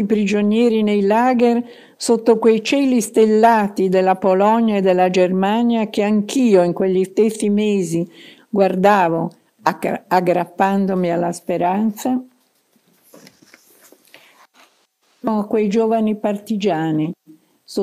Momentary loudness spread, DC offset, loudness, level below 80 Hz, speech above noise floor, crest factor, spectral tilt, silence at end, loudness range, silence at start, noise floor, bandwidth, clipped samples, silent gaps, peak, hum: 8 LU; under 0.1%; -17 LUFS; -66 dBFS; 45 dB; 16 dB; -6 dB/octave; 0 s; 10 LU; 0 s; -61 dBFS; 15.5 kHz; under 0.1%; none; 0 dBFS; none